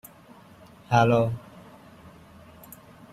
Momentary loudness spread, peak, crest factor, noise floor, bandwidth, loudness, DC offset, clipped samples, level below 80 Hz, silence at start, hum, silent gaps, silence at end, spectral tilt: 27 LU; -6 dBFS; 22 dB; -51 dBFS; 15 kHz; -23 LUFS; under 0.1%; under 0.1%; -58 dBFS; 0.9 s; none; none; 1.75 s; -7 dB/octave